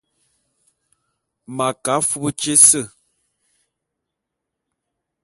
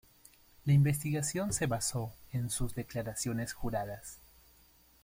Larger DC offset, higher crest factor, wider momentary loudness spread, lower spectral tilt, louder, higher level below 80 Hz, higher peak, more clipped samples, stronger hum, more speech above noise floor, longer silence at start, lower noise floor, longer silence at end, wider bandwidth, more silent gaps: neither; about the same, 22 dB vs 18 dB; first, 17 LU vs 13 LU; second, -2 dB/octave vs -5 dB/octave; first, -15 LUFS vs -34 LUFS; second, -62 dBFS vs -52 dBFS; first, 0 dBFS vs -18 dBFS; neither; neither; first, 64 dB vs 31 dB; first, 1.5 s vs 0.65 s; first, -81 dBFS vs -64 dBFS; first, 2.35 s vs 0.85 s; about the same, 16 kHz vs 16.5 kHz; neither